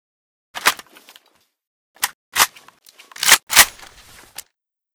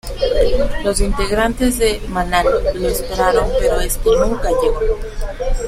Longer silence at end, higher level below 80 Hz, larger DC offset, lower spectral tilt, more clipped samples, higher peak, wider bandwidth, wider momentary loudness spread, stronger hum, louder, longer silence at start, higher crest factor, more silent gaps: first, 1.25 s vs 0 s; second, -56 dBFS vs -22 dBFS; neither; second, 2 dB/octave vs -4.5 dB/octave; neither; about the same, 0 dBFS vs 0 dBFS; first, over 20 kHz vs 16 kHz; first, 26 LU vs 6 LU; neither; about the same, -15 LUFS vs -17 LUFS; first, 0.55 s vs 0.05 s; first, 22 dB vs 14 dB; first, 1.67-1.94 s, 2.14-2.32 s, 3.43-3.47 s vs none